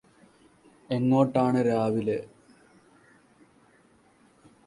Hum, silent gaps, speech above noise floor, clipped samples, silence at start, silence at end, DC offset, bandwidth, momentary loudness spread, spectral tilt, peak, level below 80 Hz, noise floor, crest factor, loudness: none; none; 37 dB; under 0.1%; 0.9 s; 2.4 s; under 0.1%; 11.5 kHz; 11 LU; -8.5 dB/octave; -8 dBFS; -66 dBFS; -61 dBFS; 20 dB; -25 LUFS